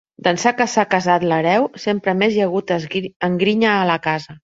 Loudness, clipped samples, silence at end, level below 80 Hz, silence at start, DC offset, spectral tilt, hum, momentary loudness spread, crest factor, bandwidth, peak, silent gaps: -18 LUFS; under 0.1%; 0.1 s; -60 dBFS; 0.25 s; under 0.1%; -5 dB/octave; none; 6 LU; 18 dB; 7.8 kHz; 0 dBFS; 3.16-3.20 s